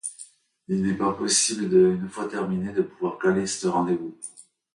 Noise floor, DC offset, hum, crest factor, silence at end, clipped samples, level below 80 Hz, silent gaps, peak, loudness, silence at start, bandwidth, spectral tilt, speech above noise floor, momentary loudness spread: -49 dBFS; under 0.1%; none; 16 dB; 0.35 s; under 0.1%; -60 dBFS; none; -8 dBFS; -24 LUFS; 0.05 s; 11.5 kHz; -4 dB/octave; 25 dB; 16 LU